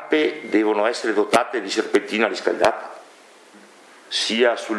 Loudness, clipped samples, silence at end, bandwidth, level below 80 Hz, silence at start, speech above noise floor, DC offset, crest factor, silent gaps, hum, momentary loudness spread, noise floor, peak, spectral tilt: -20 LUFS; under 0.1%; 0 s; 12 kHz; -66 dBFS; 0 s; 28 dB; under 0.1%; 20 dB; none; none; 5 LU; -48 dBFS; -2 dBFS; -3 dB/octave